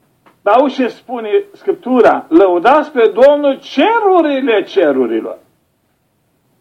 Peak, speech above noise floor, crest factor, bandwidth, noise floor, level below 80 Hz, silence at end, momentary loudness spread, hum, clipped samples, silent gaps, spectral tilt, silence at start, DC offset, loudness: 0 dBFS; 49 dB; 12 dB; 8.8 kHz; -61 dBFS; -58 dBFS; 1.25 s; 11 LU; none; under 0.1%; none; -5.5 dB/octave; 0.45 s; under 0.1%; -12 LUFS